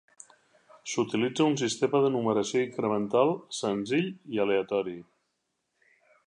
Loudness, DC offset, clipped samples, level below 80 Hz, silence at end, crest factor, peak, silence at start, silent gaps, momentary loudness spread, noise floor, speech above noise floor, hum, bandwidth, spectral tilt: -28 LUFS; under 0.1%; under 0.1%; -74 dBFS; 1.25 s; 20 dB; -10 dBFS; 0.85 s; none; 7 LU; -79 dBFS; 52 dB; none; 10.5 kHz; -5 dB/octave